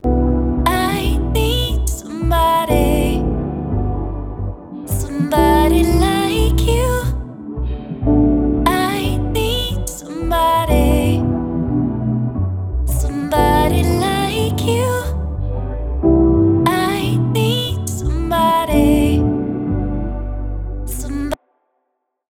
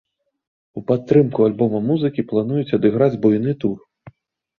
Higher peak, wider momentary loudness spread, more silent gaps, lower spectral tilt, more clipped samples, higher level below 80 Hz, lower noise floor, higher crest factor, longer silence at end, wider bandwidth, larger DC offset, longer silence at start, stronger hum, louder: about the same, -2 dBFS vs -2 dBFS; about the same, 11 LU vs 9 LU; neither; second, -6 dB/octave vs -10.5 dB/octave; neither; first, -22 dBFS vs -56 dBFS; first, -72 dBFS vs -47 dBFS; about the same, 14 dB vs 18 dB; first, 0.95 s vs 0.8 s; first, 17 kHz vs 6.2 kHz; neither; second, 0.05 s vs 0.75 s; neither; about the same, -17 LUFS vs -18 LUFS